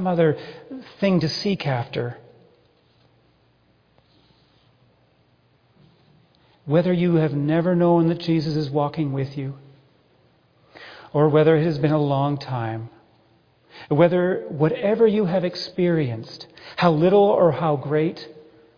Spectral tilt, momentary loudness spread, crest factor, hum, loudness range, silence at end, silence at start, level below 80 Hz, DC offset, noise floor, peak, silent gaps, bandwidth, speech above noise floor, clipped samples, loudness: -8.5 dB/octave; 19 LU; 20 dB; none; 7 LU; 0.4 s; 0 s; -60 dBFS; under 0.1%; -61 dBFS; -2 dBFS; none; 5.2 kHz; 41 dB; under 0.1%; -21 LUFS